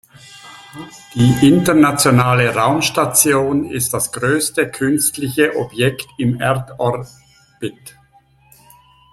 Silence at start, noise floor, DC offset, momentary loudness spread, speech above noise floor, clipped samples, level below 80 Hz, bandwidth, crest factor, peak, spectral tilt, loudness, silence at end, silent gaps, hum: 0.3 s; -52 dBFS; under 0.1%; 17 LU; 37 dB; under 0.1%; -48 dBFS; 15.5 kHz; 16 dB; 0 dBFS; -4.5 dB/octave; -15 LUFS; 1.25 s; none; none